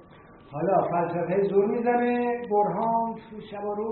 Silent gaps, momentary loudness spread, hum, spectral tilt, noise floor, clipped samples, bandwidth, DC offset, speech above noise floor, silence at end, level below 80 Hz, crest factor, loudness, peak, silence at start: none; 11 LU; none; -7 dB/octave; -50 dBFS; under 0.1%; 4.3 kHz; under 0.1%; 25 dB; 0 s; -64 dBFS; 16 dB; -25 LUFS; -10 dBFS; 0.3 s